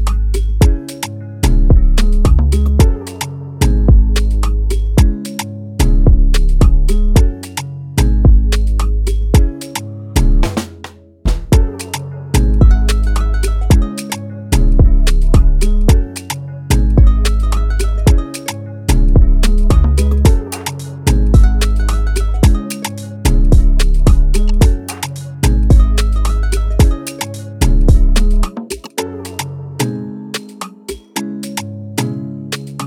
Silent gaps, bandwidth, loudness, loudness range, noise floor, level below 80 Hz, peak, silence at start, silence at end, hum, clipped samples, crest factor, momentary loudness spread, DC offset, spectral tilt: none; 15.5 kHz; -15 LUFS; 4 LU; -35 dBFS; -12 dBFS; 0 dBFS; 0 s; 0 s; none; under 0.1%; 10 dB; 13 LU; under 0.1%; -6 dB/octave